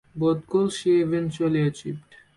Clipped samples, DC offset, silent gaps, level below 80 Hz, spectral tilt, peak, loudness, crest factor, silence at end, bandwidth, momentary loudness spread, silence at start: under 0.1%; under 0.1%; none; -60 dBFS; -7 dB/octave; -12 dBFS; -24 LUFS; 12 dB; 0.35 s; 11.5 kHz; 14 LU; 0.15 s